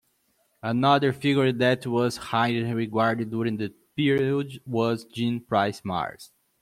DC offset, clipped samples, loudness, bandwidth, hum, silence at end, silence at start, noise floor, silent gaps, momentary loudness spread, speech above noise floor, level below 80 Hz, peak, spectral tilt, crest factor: under 0.1%; under 0.1%; -25 LUFS; 15 kHz; none; 0.35 s; 0.65 s; -69 dBFS; none; 9 LU; 44 dB; -64 dBFS; -6 dBFS; -6.5 dB/octave; 18 dB